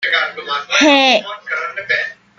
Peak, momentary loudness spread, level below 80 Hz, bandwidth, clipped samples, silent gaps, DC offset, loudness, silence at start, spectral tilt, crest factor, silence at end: 0 dBFS; 12 LU; -66 dBFS; 7.8 kHz; under 0.1%; none; under 0.1%; -14 LUFS; 0 s; -1.5 dB/octave; 16 dB; 0.25 s